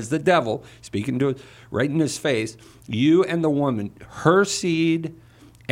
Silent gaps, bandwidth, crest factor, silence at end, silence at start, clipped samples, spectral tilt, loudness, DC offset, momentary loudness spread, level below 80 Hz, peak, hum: none; 15.5 kHz; 18 dB; 0.55 s; 0 s; under 0.1%; -5.5 dB/octave; -22 LUFS; under 0.1%; 13 LU; -58 dBFS; -4 dBFS; none